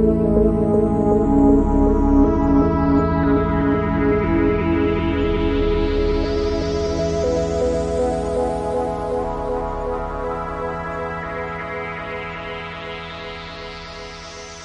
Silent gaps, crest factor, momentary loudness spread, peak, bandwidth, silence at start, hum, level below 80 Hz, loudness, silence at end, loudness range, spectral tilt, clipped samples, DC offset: none; 16 dB; 14 LU; -4 dBFS; 10 kHz; 0 s; none; -28 dBFS; -20 LUFS; 0 s; 11 LU; -7.5 dB/octave; under 0.1%; under 0.1%